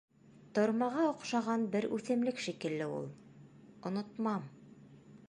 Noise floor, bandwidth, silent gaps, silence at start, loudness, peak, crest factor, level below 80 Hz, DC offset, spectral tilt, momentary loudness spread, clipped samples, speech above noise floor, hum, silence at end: -57 dBFS; 11 kHz; none; 0.35 s; -35 LUFS; -18 dBFS; 18 dB; -78 dBFS; under 0.1%; -6 dB/octave; 11 LU; under 0.1%; 23 dB; none; 0.05 s